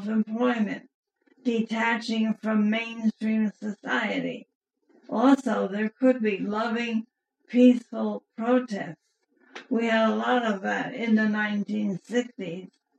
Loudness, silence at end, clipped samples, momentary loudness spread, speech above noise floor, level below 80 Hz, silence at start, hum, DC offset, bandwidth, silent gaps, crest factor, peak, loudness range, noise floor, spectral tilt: -26 LUFS; 0.35 s; under 0.1%; 13 LU; 31 dB; -82 dBFS; 0 s; none; under 0.1%; 8.8 kHz; 0.94-1.03 s, 4.55-4.61 s; 18 dB; -8 dBFS; 3 LU; -56 dBFS; -6 dB/octave